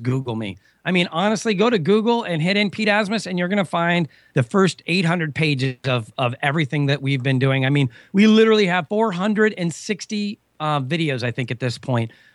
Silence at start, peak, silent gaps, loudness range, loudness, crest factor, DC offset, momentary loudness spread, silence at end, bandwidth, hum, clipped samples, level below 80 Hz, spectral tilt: 0 s; -4 dBFS; none; 3 LU; -20 LUFS; 16 dB; under 0.1%; 8 LU; 0.25 s; 11.5 kHz; none; under 0.1%; -64 dBFS; -6 dB/octave